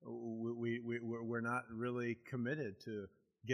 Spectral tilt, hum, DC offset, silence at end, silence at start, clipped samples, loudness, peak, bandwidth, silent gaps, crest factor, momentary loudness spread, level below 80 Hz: -7.5 dB/octave; none; under 0.1%; 0 s; 0 s; under 0.1%; -43 LUFS; -22 dBFS; 11 kHz; none; 20 dB; 8 LU; -80 dBFS